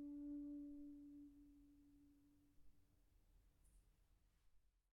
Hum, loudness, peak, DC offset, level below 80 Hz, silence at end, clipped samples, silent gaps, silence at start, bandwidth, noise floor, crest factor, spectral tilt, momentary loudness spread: none; -56 LUFS; -46 dBFS; under 0.1%; -76 dBFS; 0.15 s; under 0.1%; none; 0 s; 4.3 kHz; -78 dBFS; 14 dB; -9 dB/octave; 15 LU